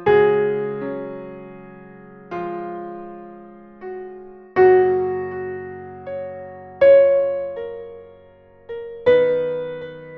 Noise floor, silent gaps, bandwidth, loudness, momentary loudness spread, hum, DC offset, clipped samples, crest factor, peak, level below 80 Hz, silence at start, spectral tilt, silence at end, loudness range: -48 dBFS; none; 5 kHz; -19 LUFS; 24 LU; none; under 0.1%; under 0.1%; 18 dB; -4 dBFS; -58 dBFS; 0 s; -5 dB/octave; 0 s; 15 LU